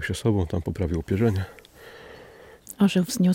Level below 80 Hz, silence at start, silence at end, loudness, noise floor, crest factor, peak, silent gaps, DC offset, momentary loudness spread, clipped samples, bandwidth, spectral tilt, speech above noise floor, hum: -46 dBFS; 0 s; 0 s; -25 LUFS; -48 dBFS; 16 dB; -10 dBFS; none; under 0.1%; 23 LU; under 0.1%; 16.5 kHz; -6.5 dB/octave; 25 dB; none